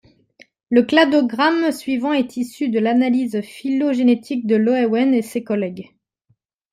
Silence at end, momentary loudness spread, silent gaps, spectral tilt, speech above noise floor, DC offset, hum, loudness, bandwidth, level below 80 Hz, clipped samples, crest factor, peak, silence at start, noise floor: 0.9 s; 9 LU; none; -5.5 dB/octave; 48 dB; under 0.1%; none; -18 LUFS; 14.5 kHz; -66 dBFS; under 0.1%; 18 dB; -2 dBFS; 0.7 s; -65 dBFS